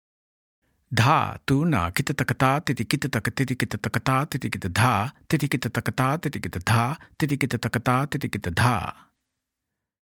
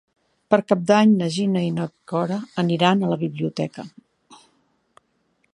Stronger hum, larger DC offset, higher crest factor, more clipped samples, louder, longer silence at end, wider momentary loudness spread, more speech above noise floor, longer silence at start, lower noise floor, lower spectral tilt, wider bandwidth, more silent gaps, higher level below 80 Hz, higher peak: neither; neither; about the same, 22 dB vs 22 dB; neither; second, -24 LUFS vs -21 LUFS; about the same, 1.1 s vs 1.2 s; second, 7 LU vs 13 LU; first, 60 dB vs 47 dB; first, 0.9 s vs 0.5 s; first, -84 dBFS vs -67 dBFS; about the same, -5.5 dB/octave vs -6.5 dB/octave; first, 19 kHz vs 10.5 kHz; neither; first, -52 dBFS vs -68 dBFS; about the same, -4 dBFS vs -2 dBFS